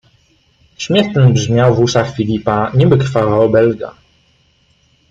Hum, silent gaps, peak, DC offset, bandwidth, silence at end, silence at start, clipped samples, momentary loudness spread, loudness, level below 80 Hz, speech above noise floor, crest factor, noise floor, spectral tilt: none; none; 0 dBFS; under 0.1%; 7.6 kHz; 1.2 s; 0.8 s; under 0.1%; 6 LU; -13 LUFS; -44 dBFS; 43 dB; 14 dB; -55 dBFS; -6.5 dB/octave